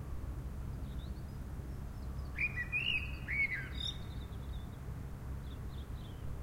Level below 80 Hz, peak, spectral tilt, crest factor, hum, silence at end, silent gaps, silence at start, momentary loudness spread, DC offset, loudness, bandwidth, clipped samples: -46 dBFS; -24 dBFS; -5 dB/octave; 16 dB; none; 0 s; none; 0 s; 12 LU; under 0.1%; -40 LUFS; 16 kHz; under 0.1%